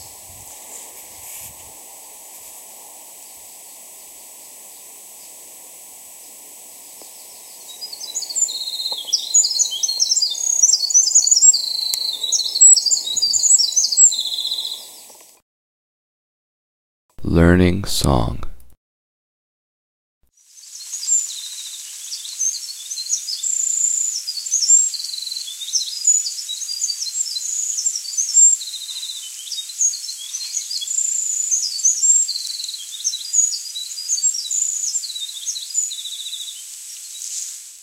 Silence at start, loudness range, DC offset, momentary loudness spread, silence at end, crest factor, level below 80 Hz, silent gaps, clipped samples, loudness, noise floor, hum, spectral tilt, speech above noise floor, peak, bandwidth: 0 s; 23 LU; under 0.1%; 25 LU; 0 s; 22 dB; -42 dBFS; 15.42-17.09 s, 18.77-20.21 s; under 0.1%; -16 LUFS; -46 dBFS; none; -1.5 dB/octave; 30 dB; 0 dBFS; 16 kHz